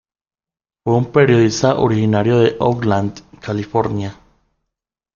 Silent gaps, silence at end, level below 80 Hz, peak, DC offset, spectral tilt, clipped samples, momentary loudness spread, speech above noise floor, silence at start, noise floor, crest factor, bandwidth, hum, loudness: none; 1 s; -50 dBFS; -2 dBFS; under 0.1%; -6.5 dB/octave; under 0.1%; 13 LU; over 75 dB; 0.85 s; under -90 dBFS; 16 dB; 7.4 kHz; none; -16 LUFS